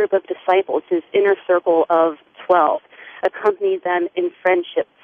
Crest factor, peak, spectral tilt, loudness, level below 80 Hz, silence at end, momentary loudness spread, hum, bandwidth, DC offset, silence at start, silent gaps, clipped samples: 16 dB; -4 dBFS; -6.5 dB/octave; -19 LUFS; -70 dBFS; 0.2 s; 7 LU; none; 4.7 kHz; under 0.1%; 0 s; none; under 0.1%